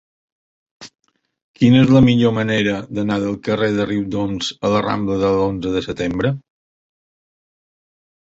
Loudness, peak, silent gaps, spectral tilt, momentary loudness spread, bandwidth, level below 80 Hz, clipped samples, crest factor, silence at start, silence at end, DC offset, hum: -17 LUFS; -2 dBFS; 1.42-1.54 s; -7 dB/octave; 10 LU; 8 kHz; -46 dBFS; under 0.1%; 18 dB; 0.8 s; 1.9 s; under 0.1%; none